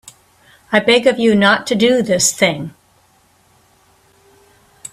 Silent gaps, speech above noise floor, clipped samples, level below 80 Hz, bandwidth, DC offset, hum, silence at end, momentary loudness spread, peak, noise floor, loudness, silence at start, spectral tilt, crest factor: none; 41 dB; under 0.1%; -56 dBFS; 15 kHz; under 0.1%; none; 0.05 s; 13 LU; 0 dBFS; -54 dBFS; -13 LUFS; 0.7 s; -3 dB/octave; 18 dB